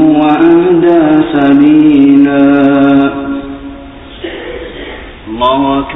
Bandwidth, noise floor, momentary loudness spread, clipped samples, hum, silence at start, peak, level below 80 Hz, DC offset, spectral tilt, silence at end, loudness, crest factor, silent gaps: 4 kHz; -28 dBFS; 19 LU; 0.7%; none; 0 s; 0 dBFS; -36 dBFS; under 0.1%; -9 dB/octave; 0 s; -7 LUFS; 8 dB; none